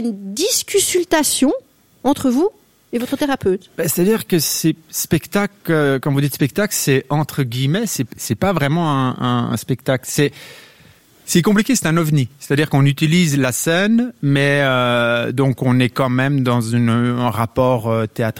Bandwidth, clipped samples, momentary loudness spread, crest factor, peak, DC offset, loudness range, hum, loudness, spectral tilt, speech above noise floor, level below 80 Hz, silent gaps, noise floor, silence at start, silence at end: 17 kHz; under 0.1%; 6 LU; 16 dB; -2 dBFS; under 0.1%; 3 LU; none; -17 LUFS; -5 dB/octave; 32 dB; -48 dBFS; none; -48 dBFS; 0 s; 0 s